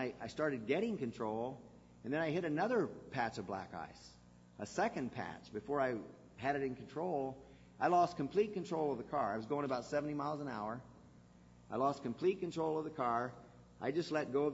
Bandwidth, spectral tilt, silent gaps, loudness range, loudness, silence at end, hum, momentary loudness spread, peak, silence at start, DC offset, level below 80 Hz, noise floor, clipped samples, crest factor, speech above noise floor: 7.6 kHz; -5 dB/octave; none; 4 LU; -39 LUFS; 0 s; 60 Hz at -65 dBFS; 11 LU; -20 dBFS; 0 s; under 0.1%; -70 dBFS; -62 dBFS; under 0.1%; 20 dB; 24 dB